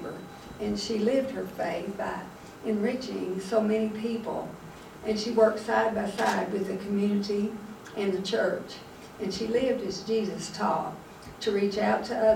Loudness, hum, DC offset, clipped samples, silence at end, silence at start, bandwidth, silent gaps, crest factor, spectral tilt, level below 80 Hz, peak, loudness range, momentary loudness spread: -29 LUFS; none; under 0.1%; under 0.1%; 0 s; 0 s; 16.5 kHz; none; 20 dB; -5.5 dB/octave; -60 dBFS; -10 dBFS; 3 LU; 14 LU